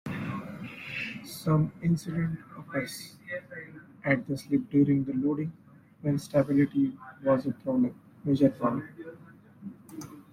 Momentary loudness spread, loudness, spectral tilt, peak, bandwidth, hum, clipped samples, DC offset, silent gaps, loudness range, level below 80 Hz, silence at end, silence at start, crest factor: 19 LU; -29 LUFS; -7.5 dB/octave; -10 dBFS; 15.5 kHz; none; under 0.1%; under 0.1%; none; 4 LU; -62 dBFS; 0.1 s; 0.05 s; 20 dB